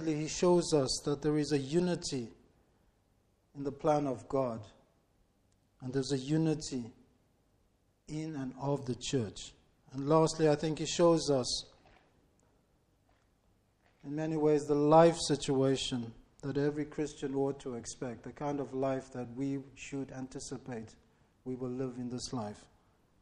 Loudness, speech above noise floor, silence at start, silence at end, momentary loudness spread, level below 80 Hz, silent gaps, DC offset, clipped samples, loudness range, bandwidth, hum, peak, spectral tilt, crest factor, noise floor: -33 LUFS; 40 dB; 0 s; 0.6 s; 16 LU; -60 dBFS; none; under 0.1%; under 0.1%; 10 LU; 11.5 kHz; none; -12 dBFS; -5.5 dB/octave; 22 dB; -72 dBFS